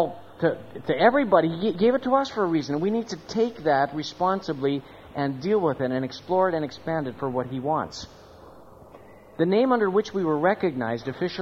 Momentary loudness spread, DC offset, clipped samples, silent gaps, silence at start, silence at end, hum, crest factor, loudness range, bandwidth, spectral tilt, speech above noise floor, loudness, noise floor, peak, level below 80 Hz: 9 LU; under 0.1%; under 0.1%; none; 0 s; 0 s; none; 22 dB; 5 LU; 7.8 kHz; -6.5 dB/octave; 24 dB; -25 LUFS; -48 dBFS; -4 dBFS; -60 dBFS